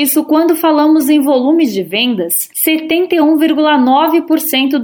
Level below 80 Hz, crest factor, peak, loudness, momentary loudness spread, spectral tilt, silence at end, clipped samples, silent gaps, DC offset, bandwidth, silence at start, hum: -62 dBFS; 10 dB; -2 dBFS; -11 LUFS; 4 LU; -3 dB/octave; 0 s; under 0.1%; none; under 0.1%; 18 kHz; 0 s; none